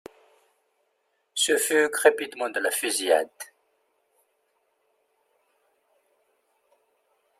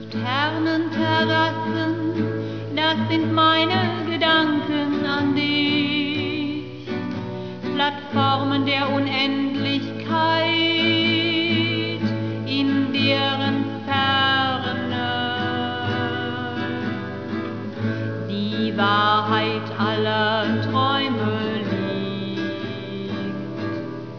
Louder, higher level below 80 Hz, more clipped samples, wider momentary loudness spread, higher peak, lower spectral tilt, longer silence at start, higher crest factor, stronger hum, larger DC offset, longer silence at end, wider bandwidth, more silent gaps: about the same, -24 LUFS vs -22 LUFS; second, -80 dBFS vs -64 dBFS; neither; first, 15 LU vs 10 LU; about the same, -4 dBFS vs -6 dBFS; second, 0 dB/octave vs -6.5 dB/octave; first, 1.35 s vs 0 s; first, 26 dB vs 16 dB; neither; second, under 0.1% vs 0.4%; first, 3.95 s vs 0 s; first, 16 kHz vs 5.4 kHz; neither